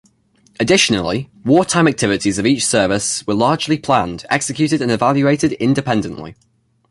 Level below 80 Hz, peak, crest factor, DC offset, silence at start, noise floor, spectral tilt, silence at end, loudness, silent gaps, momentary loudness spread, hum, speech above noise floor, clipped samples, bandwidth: -46 dBFS; 0 dBFS; 16 dB; under 0.1%; 0.6 s; -55 dBFS; -4.5 dB/octave; 0.6 s; -16 LUFS; none; 7 LU; none; 40 dB; under 0.1%; 11.5 kHz